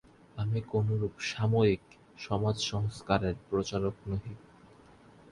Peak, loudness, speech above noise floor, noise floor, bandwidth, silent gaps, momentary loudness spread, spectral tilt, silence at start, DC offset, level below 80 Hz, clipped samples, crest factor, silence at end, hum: -12 dBFS; -32 LUFS; 26 dB; -57 dBFS; 11 kHz; none; 11 LU; -6 dB/octave; 0.35 s; under 0.1%; -52 dBFS; under 0.1%; 20 dB; 0.95 s; none